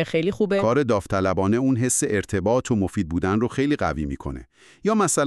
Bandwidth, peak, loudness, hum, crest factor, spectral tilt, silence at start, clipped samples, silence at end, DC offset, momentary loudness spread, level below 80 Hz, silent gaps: 13.5 kHz; -8 dBFS; -22 LUFS; none; 14 dB; -5.5 dB/octave; 0 s; under 0.1%; 0 s; under 0.1%; 8 LU; -44 dBFS; none